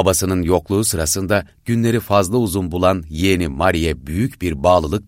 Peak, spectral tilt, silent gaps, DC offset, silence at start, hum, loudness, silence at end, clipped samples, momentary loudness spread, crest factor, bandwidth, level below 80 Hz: -2 dBFS; -5 dB/octave; none; under 0.1%; 0 s; none; -18 LUFS; 0.05 s; under 0.1%; 6 LU; 16 dB; 16.5 kHz; -34 dBFS